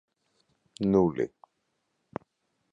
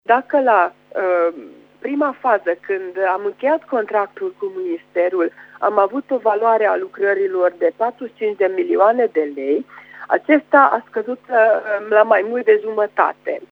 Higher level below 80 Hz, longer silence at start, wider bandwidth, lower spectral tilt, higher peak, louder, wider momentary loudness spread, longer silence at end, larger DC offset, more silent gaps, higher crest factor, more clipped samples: first, -60 dBFS vs -76 dBFS; first, 0.8 s vs 0.1 s; first, 9.6 kHz vs 5.4 kHz; first, -8.5 dB/octave vs -6.5 dB/octave; second, -10 dBFS vs 0 dBFS; second, -27 LUFS vs -18 LUFS; first, 19 LU vs 10 LU; first, 1.45 s vs 0.05 s; neither; neither; about the same, 22 dB vs 18 dB; neither